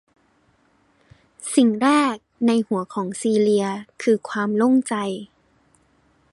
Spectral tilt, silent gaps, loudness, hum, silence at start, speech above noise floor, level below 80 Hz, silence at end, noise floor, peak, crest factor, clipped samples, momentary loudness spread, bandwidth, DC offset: -5 dB/octave; none; -21 LUFS; none; 1.4 s; 42 dB; -66 dBFS; 1.05 s; -62 dBFS; -4 dBFS; 18 dB; under 0.1%; 10 LU; 11.5 kHz; under 0.1%